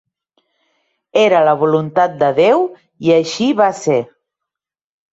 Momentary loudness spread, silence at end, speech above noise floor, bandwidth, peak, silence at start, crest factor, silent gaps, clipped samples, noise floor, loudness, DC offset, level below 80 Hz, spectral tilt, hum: 8 LU; 1.1 s; 69 dB; 8 kHz; -2 dBFS; 1.15 s; 14 dB; none; under 0.1%; -82 dBFS; -14 LUFS; under 0.1%; -62 dBFS; -5.5 dB/octave; none